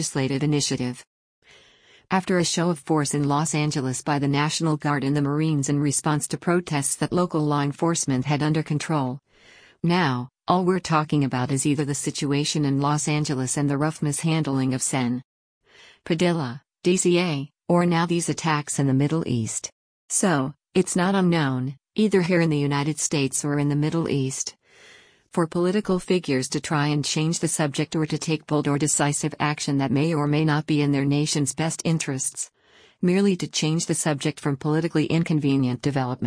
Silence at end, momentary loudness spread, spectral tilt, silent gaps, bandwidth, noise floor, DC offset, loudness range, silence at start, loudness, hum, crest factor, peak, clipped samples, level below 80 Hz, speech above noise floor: 0 s; 5 LU; -5 dB/octave; 1.07-1.42 s, 15.24-15.61 s, 19.72-20.08 s; 10.5 kHz; -55 dBFS; under 0.1%; 2 LU; 0 s; -23 LUFS; none; 16 dB; -8 dBFS; under 0.1%; -58 dBFS; 33 dB